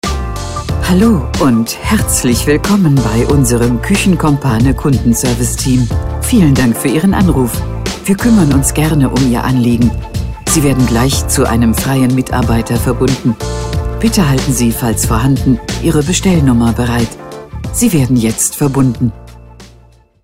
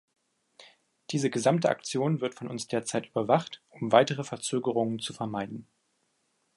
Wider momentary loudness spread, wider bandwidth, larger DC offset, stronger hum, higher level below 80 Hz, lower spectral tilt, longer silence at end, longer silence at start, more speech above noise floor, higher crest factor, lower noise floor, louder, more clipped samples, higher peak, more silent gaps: second, 8 LU vs 12 LU; first, 16.5 kHz vs 11.5 kHz; first, 0.5% vs under 0.1%; neither; first, -22 dBFS vs -74 dBFS; about the same, -5.5 dB/octave vs -5 dB/octave; second, 0.55 s vs 0.95 s; second, 0.05 s vs 0.6 s; second, 33 dB vs 46 dB; second, 12 dB vs 24 dB; second, -43 dBFS vs -74 dBFS; first, -12 LUFS vs -29 LUFS; neither; first, 0 dBFS vs -6 dBFS; neither